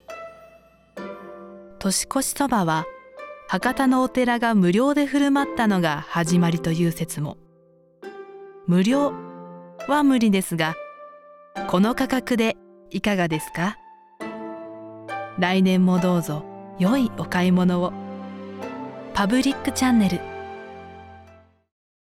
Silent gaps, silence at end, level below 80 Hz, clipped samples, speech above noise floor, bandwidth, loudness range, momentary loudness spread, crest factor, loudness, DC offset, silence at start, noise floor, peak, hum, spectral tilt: none; 0.9 s; -54 dBFS; under 0.1%; 36 dB; 16 kHz; 5 LU; 20 LU; 18 dB; -22 LUFS; under 0.1%; 0.1 s; -56 dBFS; -6 dBFS; none; -5.5 dB/octave